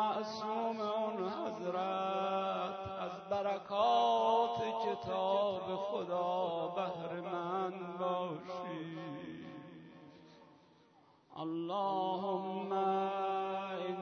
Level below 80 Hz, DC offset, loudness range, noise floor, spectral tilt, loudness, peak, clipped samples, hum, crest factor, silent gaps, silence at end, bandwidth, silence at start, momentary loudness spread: -78 dBFS; under 0.1%; 10 LU; -66 dBFS; -4 dB/octave; -37 LUFS; -20 dBFS; under 0.1%; none; 16 dB; none; 0 s; 6.4 kHz; 0 s; 12 LU